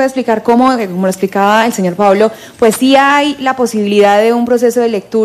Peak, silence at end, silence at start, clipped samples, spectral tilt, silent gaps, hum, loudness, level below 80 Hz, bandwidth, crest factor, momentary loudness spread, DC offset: 0 dBFS; 0 s; 0 s; 0.2%; -5 dB/octave; none; none; -11 LUFS; -54 dBFS; 15 kHz; 10 dB; 6 LU; under 0.1%